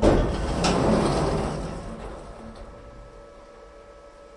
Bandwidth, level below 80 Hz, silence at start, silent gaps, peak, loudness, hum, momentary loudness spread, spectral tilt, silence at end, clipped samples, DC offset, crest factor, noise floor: 11.5 kHz; -34 dBFS; 0 s; none; -4 dBFS; -25 LUFS; none; 25 LU; -6 dB/octave; 0 s; under 0.1%; under 0.1%; 22 dB; -47 dBFS